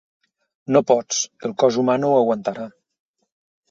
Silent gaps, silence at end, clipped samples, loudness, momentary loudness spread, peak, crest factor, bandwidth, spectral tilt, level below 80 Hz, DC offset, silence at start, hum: none; 1 s; under 0.1%; -19 LUFS; 15 LU; -2 dBFS; 20 dB; 7.8 kHz; -4.5 dB/octave; -66 dBFS; under 0.1%; 0.7 s; none